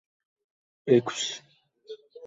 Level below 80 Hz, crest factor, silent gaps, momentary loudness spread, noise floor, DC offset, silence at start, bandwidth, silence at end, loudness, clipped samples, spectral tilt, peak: -72 dBFS; 24 dB; none; 23 LU; -47 dBFS; under 0.1%; 0.85 s; 8 kHz; 0 s; -26 LUFS; under 0.1%; -4.5 dB/octave; -8 dBFS